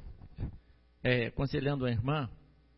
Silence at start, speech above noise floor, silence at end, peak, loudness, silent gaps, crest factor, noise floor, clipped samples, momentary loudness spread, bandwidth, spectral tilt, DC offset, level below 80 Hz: 0 s; 25 dB; 0.4 s; -16 dBFS; -34 LUFS; none; 18 dB; -57 dBFS; under 0.1%; 13 LU; 5.6 kHz; -5.5 dB/octave; under 0.1%; -48 dBFS